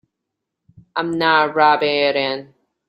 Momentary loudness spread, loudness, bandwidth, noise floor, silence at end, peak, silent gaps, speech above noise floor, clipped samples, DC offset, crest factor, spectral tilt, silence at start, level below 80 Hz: 11 LU; -17 LUFS; 12 kHz; -80 dBFS; 0.45 s; -2 dBFS; none; 63 dB; under 0.1%; under 0.1%; 18 dB; -6 dB/octave; 0.95 s; -64 dBFS